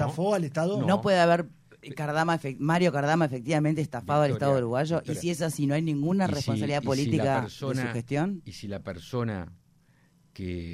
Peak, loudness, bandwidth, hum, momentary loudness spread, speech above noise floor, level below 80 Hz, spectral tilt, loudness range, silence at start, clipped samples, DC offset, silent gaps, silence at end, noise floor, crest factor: -10 dBFS; -27 LUFS; 15 kHz; none; 13 LU; 36 dB; -58 dBFS; -6.5 dB/octave; 5 LU; 0 s; under 0.1%; under 0.1%; none; 0 s; -62 dBFS; 16 dB